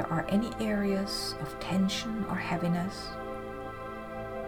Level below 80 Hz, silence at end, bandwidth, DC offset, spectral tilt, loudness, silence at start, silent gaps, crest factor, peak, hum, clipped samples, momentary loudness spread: -50 dBFS; 0 s; 18 kHz; under 0.1%; -5.5 dB/octave; -32 LUFS; 0 s; none; 16 dB; -16 dBFS; none; under 0.1%; 10 LU